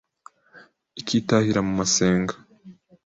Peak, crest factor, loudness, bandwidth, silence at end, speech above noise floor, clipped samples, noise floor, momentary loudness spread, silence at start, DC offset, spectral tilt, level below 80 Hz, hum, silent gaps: -4 dBFS; 20 dB; -22 LUFS; 8 kHz; 0.35 s; 31 dB; under 0.1%; -53 dBFS; 17 LU; 0.55 s; under 0.1%; -4.5 dB/octave; -52 dBFS; none; none